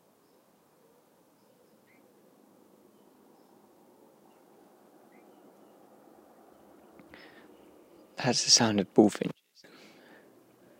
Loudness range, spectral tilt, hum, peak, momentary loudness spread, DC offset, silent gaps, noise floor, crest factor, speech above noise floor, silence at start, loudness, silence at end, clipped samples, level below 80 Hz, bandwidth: 9 LU; -3 dB/octave; none; -8 dBFS; 31 LU; under 0.1%; none; -64 dBFS; 28 dB; 39 dB; 8.2 s; -25 LUFS; 1.45 s; under 0.1%; -76 dBFS; 16 kHz